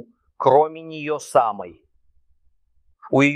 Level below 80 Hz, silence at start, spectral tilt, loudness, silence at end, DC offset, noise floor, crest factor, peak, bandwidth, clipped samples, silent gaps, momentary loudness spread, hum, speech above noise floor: -66 dBFS; 0.4 s; -6 dB/octave; -20 LUFS; 0 s; under 0.1%; -60 dBFS; 20 dB; -2 dBFS; 14 kHz; under 0.1%; none; 15 LU; none; 41 dB